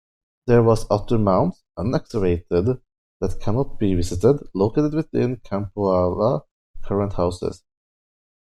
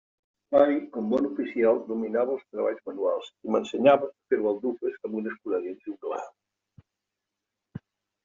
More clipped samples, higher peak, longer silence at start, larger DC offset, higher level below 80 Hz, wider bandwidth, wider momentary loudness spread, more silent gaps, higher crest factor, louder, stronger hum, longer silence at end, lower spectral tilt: neither; about the same, -4 dBFS vs -6 dBFS; about the same, 0.45 s vs 0.5 s; neither; first, -38 dBFS vs -70 dBFS; first, 12.5 kHz vs 7.4 kHz; second, 10 LU vs 15 LU; first, 2.98-3.20 s, 6.51-6.74 s vs none; about the same, 18 dB vs 22 dB; first, -22 LUFS vs -27 LUFS; neither; first, 1 s vs 0.45 s; first, -8 dB/octave vs -5 dB/octave